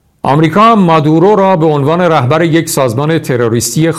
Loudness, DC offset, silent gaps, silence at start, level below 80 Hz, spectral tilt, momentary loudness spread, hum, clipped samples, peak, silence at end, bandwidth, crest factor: -9 LUFS; 0.2%; none; 0.25 s; -46 dBFS; -6 dB/octave; 6 LU; none; under 0.1%; 0 dBFS; 0 s; 15 kHz; 8 dB